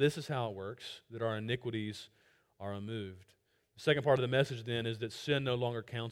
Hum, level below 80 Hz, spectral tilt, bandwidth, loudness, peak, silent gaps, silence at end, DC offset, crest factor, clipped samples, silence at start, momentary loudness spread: none; -70 dBFS; -6 dB/octave; 16 kHz; -35 LUFS; -16 dBFS; none; 0 s; under 0.1%; 20 dB; under 0.1%; 0 s; 16 LU